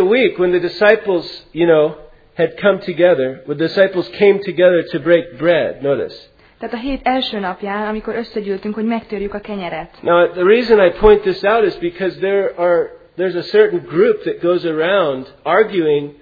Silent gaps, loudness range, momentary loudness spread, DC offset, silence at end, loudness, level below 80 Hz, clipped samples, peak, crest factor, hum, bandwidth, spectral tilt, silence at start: none; 7 LU; 11 LU; under 0.1%; 0.1 s; -16 LUFS; -40 dBFS; under 0.1%; 0 dBFS; 16 dB; none; 5 kHz; -8 dB/octave; 0 s